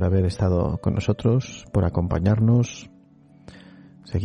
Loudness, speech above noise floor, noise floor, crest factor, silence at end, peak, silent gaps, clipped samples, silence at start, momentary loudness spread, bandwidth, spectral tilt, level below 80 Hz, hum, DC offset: -23 LUFS; 31 dB; -52 dBFS; 14 dB; 0 s; -8 dBFS; none; under 0.1%; 0 s; 8 LU; 9.2 kHz; -8 dB/octave; -40 dBFS; none; under 0.1%